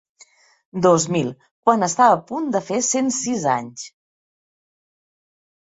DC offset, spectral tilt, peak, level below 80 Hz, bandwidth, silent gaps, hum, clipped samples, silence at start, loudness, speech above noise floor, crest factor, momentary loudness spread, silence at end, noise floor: under 0.1%; -4.5 dB/octave; -2 dBFS; -64 dBFS; 8.2 kHz; 1.51-1.63 s; none; under 0.1%; 0.75 s; -19 LUFS; 34 dB; 20 dB; 16 LU; 1.9 s; -53 dBFS